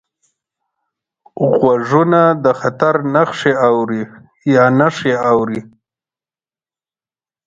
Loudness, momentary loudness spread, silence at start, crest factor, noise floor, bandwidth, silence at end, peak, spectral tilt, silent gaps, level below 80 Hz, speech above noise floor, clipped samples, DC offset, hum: -14 LUFS; 10 LU; 1.35 s; 16 dB; under -90 dBFS; 7.8 kHz; 1.8 s; 0 dBFS; -7 dB/octave; none; -58 dBFS; over 77 dB; under 0.1%; under 0.1%; none